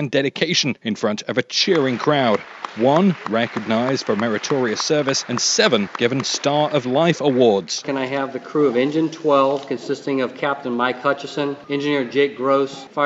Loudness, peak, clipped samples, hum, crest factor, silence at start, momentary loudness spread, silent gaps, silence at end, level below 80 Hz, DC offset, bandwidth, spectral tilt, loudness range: -19 LUFS; -2 dBFS; under 0.1%; none; 18 dB; 0 s; 7 LU; none; 0 s; -68 dBFS; under 0.1%; 8 kHz; -4 dB/octave; 3 LU